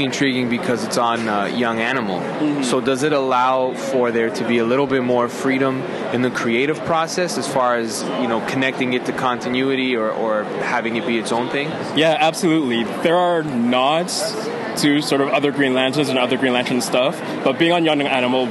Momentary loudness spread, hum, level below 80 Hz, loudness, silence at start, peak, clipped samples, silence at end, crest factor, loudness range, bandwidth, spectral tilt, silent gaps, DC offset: 5 LU; none; -62 dBFS; -19 LUFS; 0 s; -2 dBFS; under 0.1%; 0 s; 16 dB; 2 LU; 12.5 kHz; -4.5 dB/octave; none; under 0.1%